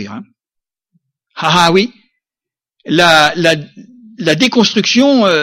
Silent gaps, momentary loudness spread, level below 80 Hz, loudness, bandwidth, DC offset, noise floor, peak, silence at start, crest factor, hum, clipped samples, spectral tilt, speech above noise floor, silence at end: none; 11 LU; -52 dBFS; -11 LUFS; 16.5 kHz; under 0.1%; -87 dBFS; 0 dBFS; 0 s; 14 dB; none; under 0.1%; -4 dB/octave; 76 dB; 0 s